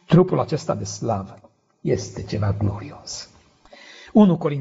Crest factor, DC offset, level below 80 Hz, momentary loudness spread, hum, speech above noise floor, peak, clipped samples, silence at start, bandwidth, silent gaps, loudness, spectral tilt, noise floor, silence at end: 20 dB; under 0.1%; -50 dBFS; 18 LU; none; 29 dB; -2 dBFS; under 0.1%; 0.1 s; 8 kHz; none; -22 LUFS; -7.5 dB/octave; -50 dBFS; 0 s